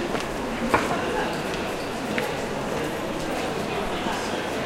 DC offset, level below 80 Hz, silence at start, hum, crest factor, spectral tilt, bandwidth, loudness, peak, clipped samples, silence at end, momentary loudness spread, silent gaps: under 0.1%; -44 dBFS; 0 s; none; 22 dB; -4.5 dB/octave; 16 kHz; -27 LUFS; -6 dBFS; under 0.1%; 0 s; 5 LU; none